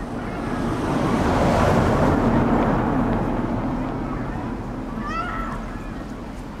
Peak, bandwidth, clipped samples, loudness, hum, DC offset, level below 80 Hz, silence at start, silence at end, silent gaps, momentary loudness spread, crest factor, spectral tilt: -6 dBFS; 14.5 kHz; under 0.1%; -23 LUFS; none; under 0.1%; -32 dBFS; 0 s; 0 s; none; 14 LU; 16 dB; -7.5 dB/octave